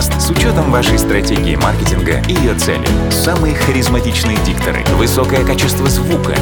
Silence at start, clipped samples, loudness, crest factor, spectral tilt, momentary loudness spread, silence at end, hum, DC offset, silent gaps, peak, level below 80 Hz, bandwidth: 0 s; under 0.1%; -13 LUFS; 12 dB; -5 dB/octave; 2 LU; 0 s; none; under 0.1%; none; 0 dBFS; -20 dBFS; over 20 kHz